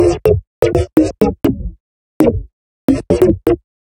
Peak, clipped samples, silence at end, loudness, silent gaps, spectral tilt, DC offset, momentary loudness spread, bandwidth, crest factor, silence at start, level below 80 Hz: 0 dBFS; under 0.1%; 0.35 s; -15 LUFS; 0.47-0.62 s, 1.80-2.20 s, 2.53-2.88 s; -8 dB/octave; under 0.1%; 9 LU; 17 kHz; 14 dB; 0 s; -30 dBFS